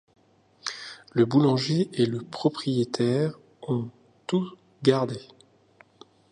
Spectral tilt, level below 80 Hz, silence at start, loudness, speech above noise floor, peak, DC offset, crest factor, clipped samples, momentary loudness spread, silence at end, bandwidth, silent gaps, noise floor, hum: -6.5 dB/octave; -68 dBFS; 0.65 s; -26 LUFS; 34 dB; -6 dBFS; under 0.1%; 20 dB; under 0.1%; 16 LU; 1.1 s; 10.5 kHz; none; -58 dBFS; none